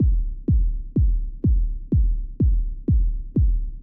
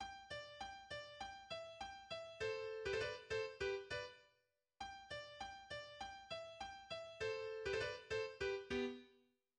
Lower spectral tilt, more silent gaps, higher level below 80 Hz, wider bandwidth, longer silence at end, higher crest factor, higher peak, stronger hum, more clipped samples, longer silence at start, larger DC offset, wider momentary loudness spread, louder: first, -15.5 dB/octave vs -3.5 dB/octave; neither; first, -22 dBFS vs -70 dBFS; second, 0.7 kHz vs 10.5 kHz; second, 0 s vs 0.4 s; second, 8 dB vs 18 dB; first, -12 dBFS vs -30 dBFS; neither; neither; about the same, 0 s vs 0 s; neither; second, 3 LU vs 10 LU; first, -24 LUFS vs -47 LUFS